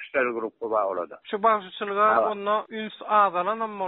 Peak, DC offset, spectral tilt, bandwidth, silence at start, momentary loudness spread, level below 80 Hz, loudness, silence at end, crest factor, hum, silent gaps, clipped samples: -8 dBFS; under 0.1%; -2 dB/octave; 4.2 kHz; 0 s; 12 LU; -72 dBFS; -25 LUFS; 0 s; 18 dB; none; none; under 0.1%